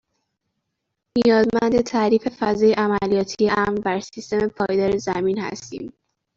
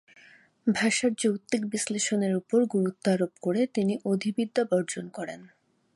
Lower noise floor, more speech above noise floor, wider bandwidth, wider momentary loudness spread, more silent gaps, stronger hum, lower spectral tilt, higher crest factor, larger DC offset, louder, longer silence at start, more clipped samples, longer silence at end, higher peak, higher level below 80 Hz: first, -78 dBFS vs -57 dBFS; first, 58 dB vs 30 dB; second, 7.6 kHz vs 11.5 kHz; about the same, 10 LU vs 10 LU; neither; neither; about the same, -5.5 dB/octave vs -4.5 dB/octave; about the same, 16 dB vs 16 dB; neither; first, -20 LUFS vs -27 LUFS; first, 1.15 s vs 0.65 s; neither; about the same, 0.5 s vs 0.5 s; first, -6 dBFS vs -12 dBFS; first, -52 dBFS vs -74 dBFS